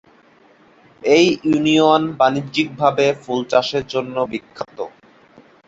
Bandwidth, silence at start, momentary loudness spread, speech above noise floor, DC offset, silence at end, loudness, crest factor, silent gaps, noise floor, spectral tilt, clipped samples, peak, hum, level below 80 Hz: 7.8 kHz; 1.05 s; 15 LU; 34 dB; under 0.1%; 0.8 s; -17 LUFS; 18 dB; none; -51 dBFS; -5 dB/octave; under 0.1%; -2 dBFS; none; -58 dBFS